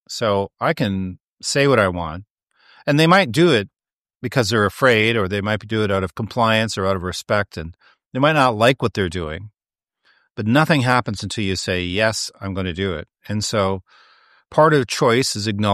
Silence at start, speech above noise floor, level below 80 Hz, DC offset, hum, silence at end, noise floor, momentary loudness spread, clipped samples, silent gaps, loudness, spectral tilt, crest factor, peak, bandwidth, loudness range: 0.1 s; 66 dB; -48 dBFS; under 0.1%; none; 0 s; -85 dBFS; 14 LU; under 0.1%; 1.20-1.37 s, 2.30-2.37 s, 3.93-4.05 s, 4.15-4.20 s, 8.06-8.11 s; -19 LUFS; -5 dB/octave; 18 dB; -2 dBFS; 14.5 kHz; 4 LU